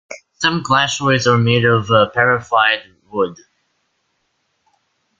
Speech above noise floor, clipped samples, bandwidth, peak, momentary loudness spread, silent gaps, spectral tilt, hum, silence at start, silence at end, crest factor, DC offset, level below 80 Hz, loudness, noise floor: 52 dB; under 0.1%; 7.8 kHz; 0 dBFS; 9 LU; none; -4.5 dB/octave; none; 0.1 s; 1.85 s; 18 dB; under 0.1%; -54 dBFS; -15 LUFS; -68 dBFS